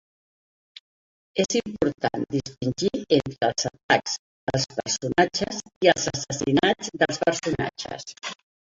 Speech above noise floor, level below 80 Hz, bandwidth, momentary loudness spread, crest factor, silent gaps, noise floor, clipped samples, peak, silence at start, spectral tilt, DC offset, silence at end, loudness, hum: over 65 dB; -54 dBFS; 8 kHz; 10 LU; 22 dB; 3.83-3.89 s, 4.19-4.47 s, 5.76-5.81 s; under -90 dBFS; under 0.1%; -4 dBFS; 1.35 s; -4 dB/octave; under 0.1%; 0.4 s; -25 LUFS; none